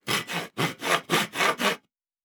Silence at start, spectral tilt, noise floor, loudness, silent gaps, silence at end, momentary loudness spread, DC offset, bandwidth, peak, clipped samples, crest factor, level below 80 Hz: 0.05 s; -2.5 dB/octave; -52 dBFS; -26 LUFS; none; 0.45 s; 7 LU; under 0.1%; over 20 kHz; -8 dBFS; under 0.1%; 20 dB; -76 dBFS